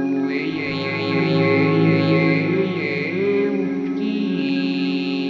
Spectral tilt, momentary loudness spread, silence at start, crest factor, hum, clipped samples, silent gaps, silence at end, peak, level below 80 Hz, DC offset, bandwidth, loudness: -8 dB/octave; 6 LU; 0 s; 14 dB; none; under 0.1%; none; 0 s; -6 dBFS; -64 dBFS; under 0.1%; 6.8 kHz; -20 LUFS